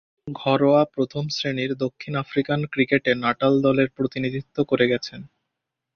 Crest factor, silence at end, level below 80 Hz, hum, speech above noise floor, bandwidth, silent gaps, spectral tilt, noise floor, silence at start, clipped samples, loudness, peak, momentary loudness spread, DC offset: 18 dB; 0.7 s; -58 dBFS; none; 60 dB; 6.8 kHz; none; -6.5 dB/octave; -82 dBFS; 0.25 s; under 0.1%; -22 LUFS; -4 dBFS; 9 LU; under 0.1%